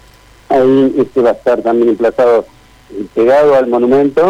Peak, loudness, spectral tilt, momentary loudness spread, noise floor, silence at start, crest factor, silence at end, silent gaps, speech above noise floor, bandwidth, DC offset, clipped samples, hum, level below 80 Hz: -4 dBFS; -11 LUFS; -7.5 dB/octave; 6 LU; -42 dBFS; 0.5 s; 8 dB; 0 s; none; 32 dB; 11 kHz; under 0.1%; under 0.1%; none; -46 dBFS